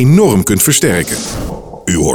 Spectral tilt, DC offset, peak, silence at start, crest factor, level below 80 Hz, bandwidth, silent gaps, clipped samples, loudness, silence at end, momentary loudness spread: -4.5 dB/octave; under 0.1%; 0 dBFS; 0 s; 12 dB; -30 dBFS; 20 kHz; none; under 0.1%; -11 LUFS; 0 s; 14 LU